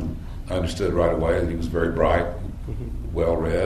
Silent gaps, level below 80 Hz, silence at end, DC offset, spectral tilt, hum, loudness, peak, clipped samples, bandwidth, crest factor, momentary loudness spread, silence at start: none; -32 dBFS; 0 s; under 0.1%; -7 dB/octave; none; -24 LUFS; -4 dBFS; under 0.1%; 13.5 kHz; 18 dB; 12 LU; 0 s